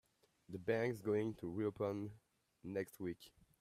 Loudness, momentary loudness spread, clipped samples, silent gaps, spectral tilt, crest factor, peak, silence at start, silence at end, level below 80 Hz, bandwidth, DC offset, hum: -42 LUFS; 15 LU; under 0.1%; none; -7.5 dB/octave; 20 dB; -24 dBFS; 0.5 s; 0.3 s; -76 dBFS; 15 kHz; under 0.1%; none